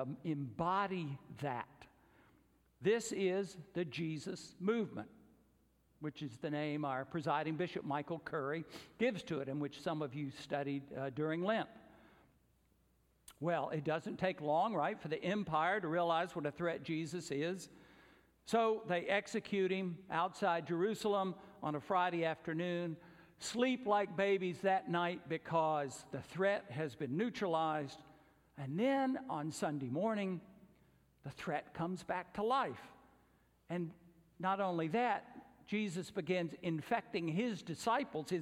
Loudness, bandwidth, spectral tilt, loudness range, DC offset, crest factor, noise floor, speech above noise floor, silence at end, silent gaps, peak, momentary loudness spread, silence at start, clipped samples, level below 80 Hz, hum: -38 LUFS; 15.5 kHz; -5.5 dB/octave; 5 LU; under 0.1%; 18 dB; -74 dBFS; 36 dB; 0 s; none; -20 dBFS; 10 LU; 0 s; under 0.1%; -76 dBFS; none